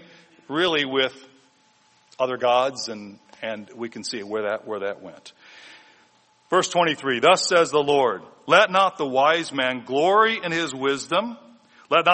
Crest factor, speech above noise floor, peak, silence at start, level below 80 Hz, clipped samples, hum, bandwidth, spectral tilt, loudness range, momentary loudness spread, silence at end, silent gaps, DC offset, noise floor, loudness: 20 dB; 38 dB; -2 dBFS; 0.5 s; -70 dBFS; under 0.1%; none; 8.8 kHz; -3 dB/octave; 11 LU; 15 LU; 0 s; none; under 0.1%; -60 dBFS; -22 LUFS